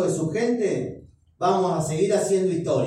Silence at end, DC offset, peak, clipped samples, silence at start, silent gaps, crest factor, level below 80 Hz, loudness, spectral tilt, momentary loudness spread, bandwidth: 0 s; under 0.1%; -8 dBFS; under 0.1%; 0 s; none; 14 dB; -58 dBFS; -23 LUFS; -6 dB/octave; 5 LU; 13 kHz